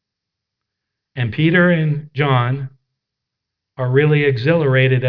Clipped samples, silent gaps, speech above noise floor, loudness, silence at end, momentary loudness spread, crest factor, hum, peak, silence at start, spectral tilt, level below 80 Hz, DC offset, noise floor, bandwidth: under 0.1%; none; 66 dB; -16 LUFS; 0 s; 12 LU; 16 dB; none; -2 dBFS; 1.15 s; -10 dB/octave; -56 dBFS; under 0.1%; -81 dBFS; 5.2 kHz